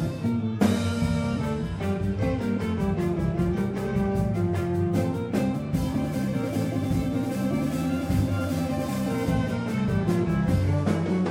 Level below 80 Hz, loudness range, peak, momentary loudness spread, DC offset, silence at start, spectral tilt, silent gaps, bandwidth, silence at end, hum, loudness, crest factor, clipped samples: -40 dBFS; 1 LU; -8 dBFS; 3 LU; under 0.1%; 0 s; -7.5 dB/octave; none; 16.5 kHz; 0 s; none; -26 LUFS; 16 dB; under 0.1%